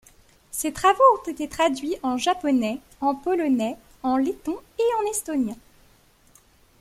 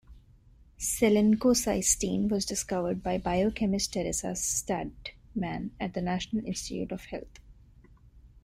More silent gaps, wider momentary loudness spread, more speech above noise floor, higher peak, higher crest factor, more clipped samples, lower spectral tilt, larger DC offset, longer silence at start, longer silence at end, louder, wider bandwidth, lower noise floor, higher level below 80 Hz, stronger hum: neither; about the same, 12 LU vs 12 LU; first, 34 dB vs 28 dB; first, -4 dBFS vs -10 dBFS; about the same, 20 dB vs 20 dB; neither; about the same, -3.5 dB/octave vs -4 dB/octave; neither; first, 0.55 s vs 0.1 s; first, 1.25 s vs 0.05 s; first, -24 LUFS vs -29 LUFS; about the same, 15.5 kHz vs 16 kHz; about the same, -57 dBFS vs -57 dBFS; second, -56 dBFS vs -50 dBFS; neither